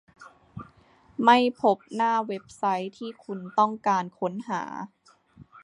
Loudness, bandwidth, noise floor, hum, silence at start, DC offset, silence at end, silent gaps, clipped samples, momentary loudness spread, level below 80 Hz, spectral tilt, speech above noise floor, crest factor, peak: -25 LUFS; 11 kHz; -58 dBFS; none; 0.2 s; under 0.1%; 0.05 s; none; under 0.1%; 22 LU; -68 dBFS; -5.5 dB/octave; 33 dB; 22 dB; -4 dBFS